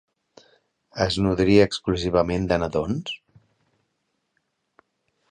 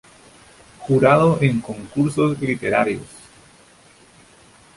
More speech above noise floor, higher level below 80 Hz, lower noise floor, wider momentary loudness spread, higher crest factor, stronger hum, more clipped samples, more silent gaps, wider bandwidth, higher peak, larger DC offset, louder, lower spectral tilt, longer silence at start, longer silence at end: first, 54 dB vs 32 dB; first, -44 dBFS vs -52 dBFS; first, -75 dBFS vs -50 dBFS; about the same, 14 LU vs 15 LU; about the same, 20 dB vs 20 dB; neither; neither; neither; second, 10 kHz vs 11.5 kHz; about the same, -4 dBFS vs -2 dBFS; neither; second, -22 LUFS vs -19 LUFS; about the same, -6 dB/octave vs -7 dB/octave; first, 0.95 s vs 0.8 s; first, 2.15 s vs 1.7 s